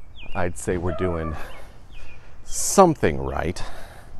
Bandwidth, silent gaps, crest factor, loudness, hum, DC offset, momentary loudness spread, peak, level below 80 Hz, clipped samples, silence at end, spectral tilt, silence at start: 13.5 kHz; none; 24 dB; -23 LUFS; none; under 0.1%; 20 LU; 0 dBFS; -38 dBFS; under 0.1%; 0 s; -5 dB/octave; 0 s